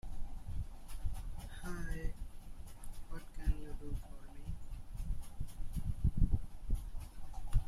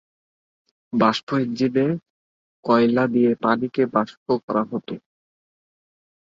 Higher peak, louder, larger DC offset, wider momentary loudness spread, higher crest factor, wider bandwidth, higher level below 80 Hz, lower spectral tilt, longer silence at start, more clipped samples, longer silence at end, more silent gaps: second, -18 dBFS vs -4 dBFS; second, -45 LUFS vs -21 LUFS; neither; first, 15 LU vs 12 LU; about the same, 18 dB vs 20 dB; first, 13.5 kHz vs 7.4 kHz; first, -40 dBFS vs -66 dBFS; about the same, -6.5 dB/octave vs -7 dB/octave; second, 0.05 s vs 0.95 s; neither; second, 0 s vs 1.4 s; second, none vs 1.23-1.27 s, 2.10-2.63 s, 4.17-4.26 s, 4.43-4.48 s